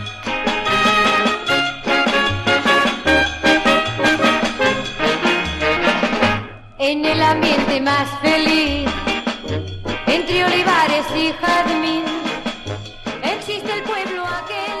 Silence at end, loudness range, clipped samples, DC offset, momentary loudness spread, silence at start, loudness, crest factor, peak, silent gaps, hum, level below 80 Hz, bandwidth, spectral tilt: 0 s; 4 LU; under 0.1%; under 0.1%; 10 LU; 0 s; -17 LUFS; 18 dB; 0 dBFS; none; none; -38 dBFS; 13 kHz; -4 dB/octave